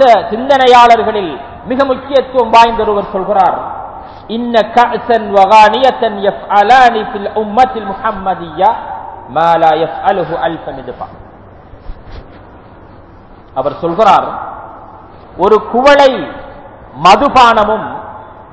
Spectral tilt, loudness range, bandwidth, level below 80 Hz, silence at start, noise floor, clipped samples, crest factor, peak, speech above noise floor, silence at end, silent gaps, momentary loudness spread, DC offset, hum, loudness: -5 dB/octave; 8 LU; 8 kHz; -38 dBFS; 0 s; -36 dBFS; 3%; 10 dB; 0 dBFS; 27 dB; 0.1 s; none; 19 LU; 0.2%; none; -10 LUFS